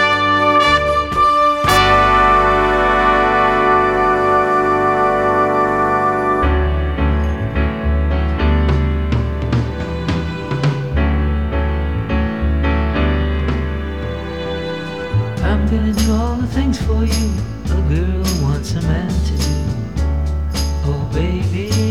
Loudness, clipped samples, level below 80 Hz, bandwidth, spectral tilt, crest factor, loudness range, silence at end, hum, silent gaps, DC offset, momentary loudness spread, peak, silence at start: -16 LUFS; under 0.1%; -22 dBFS; 14.5 kHz; -6 dB/octave; 16 dB; 7 LU; 0 s; none; none; 0.8%; 8 LU; 0 dBFS; 0 s